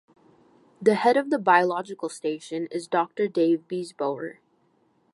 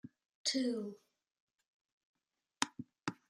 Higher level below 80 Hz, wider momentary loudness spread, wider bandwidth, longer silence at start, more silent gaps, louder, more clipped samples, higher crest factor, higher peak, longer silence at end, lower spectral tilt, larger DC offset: first, -80 dBFS vs -88 dBFS; about the same, 12 LU vs 12 LU; second, 11.5 kHz vs 13 kHz; first, 0.8 s vs 0.05 s; second, none vs 0.35-0.45 s, 1.40-1.48 s, 1.68-1.85 s, 1.92-2.14 s; first, -25 LUFS vs -39 LUFS; neither; second, 20 dB vs 30 dB; first, -4 dBFS vs -12 dBFS; first, 0.8 s vs 0.15 s; first, -5.5 dB/octave vs -2.5 dB/octave; neither